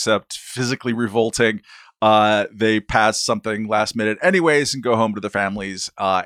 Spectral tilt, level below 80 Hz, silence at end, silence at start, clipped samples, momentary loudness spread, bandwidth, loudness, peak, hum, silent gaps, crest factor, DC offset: -4 dB/octave; -48 dBFS; 0 s; 0 s; under 0.1%; 8 LU; 15.5 kHz; -19 LUFS; 0 dBFS; none; none; 18 dB; under 0.1%